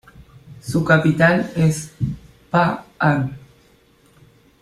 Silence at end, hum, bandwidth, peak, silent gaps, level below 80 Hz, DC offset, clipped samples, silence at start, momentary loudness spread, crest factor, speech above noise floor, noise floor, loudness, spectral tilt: 1.25 s; none; 13 kHz; -2 dBFS; none; -48 dBFS; under 0.1%; under 0.1%; 0.45 s; 12 LU; 20 dB; 37 dB; -54 dBFS; -19 LUFS; -6.5 dB/octave